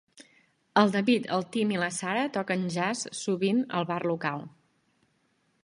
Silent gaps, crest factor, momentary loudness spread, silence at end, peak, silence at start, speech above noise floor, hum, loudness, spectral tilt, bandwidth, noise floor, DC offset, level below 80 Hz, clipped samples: none; 22 dB; 7 LU; 1.15 s; -6 dBFS; 0.2 s; 44 dB; none; -28 LUFS; -5 dB/octave; 11.5 kHz; -71 dBFS; under 0.1%; -74 dBFS; under 0.1%